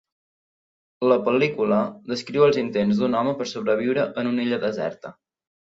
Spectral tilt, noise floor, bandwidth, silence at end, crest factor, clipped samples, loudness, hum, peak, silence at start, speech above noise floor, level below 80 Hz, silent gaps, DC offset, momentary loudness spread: -6.5 dB/octave; under -90 dBFS; 7.8 kHz; 0.65 s; 18 dB; under 0.1%; -22 LUFS; none; -6 dBFS; 1 s; over 68 dB; -64 dBFS; none; under 0.1%; 10 LU